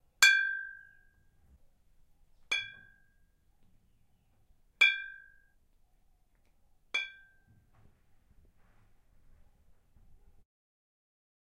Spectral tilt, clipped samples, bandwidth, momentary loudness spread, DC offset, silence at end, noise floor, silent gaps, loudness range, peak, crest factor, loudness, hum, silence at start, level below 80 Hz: 2.5 dB/octave; under 0.1%; 15.5 kHz; 23 LU; under 0.1%; 4.35 s; -68 dBFS; none; 11 LU; -8 dBFS; 30 dB; -28 LUFS; none; 0.2 s; -68 dBFS